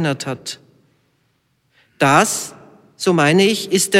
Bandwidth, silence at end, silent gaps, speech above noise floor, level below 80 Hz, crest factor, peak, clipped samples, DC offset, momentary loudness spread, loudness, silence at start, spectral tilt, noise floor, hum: 16.5 kHz; 0 s; none; 48 dB; -62 dBFS; 16 dB; -2 dBFS; under 0.1%; under 0.1%; 17 LU; -16 LUFS; 0 s; -4 dB/octave; -64 dBFS; none